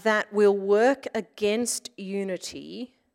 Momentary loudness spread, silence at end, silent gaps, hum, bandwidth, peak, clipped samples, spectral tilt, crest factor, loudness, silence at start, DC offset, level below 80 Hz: 16 LU; 0.3 s; none; none; 16 kHz; -10 dBFS; under 0.1%; -3.5 dB/octave; 16 dB; -25 LUFS; 0.05 s; under 0.1%; -70 dBFS